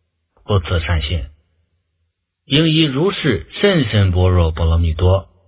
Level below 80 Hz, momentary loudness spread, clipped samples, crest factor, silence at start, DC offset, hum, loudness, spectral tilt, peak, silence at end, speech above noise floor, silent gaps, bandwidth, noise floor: -24 dBFS; 6 LU; under 0.1%; 16 dB; 0.5 s; under 0.1%; none; -16 LUFS; -11 dB/octave; 0 dBFS; 0.25 s; 55 dB; none; 4 kHz; -70 dBFS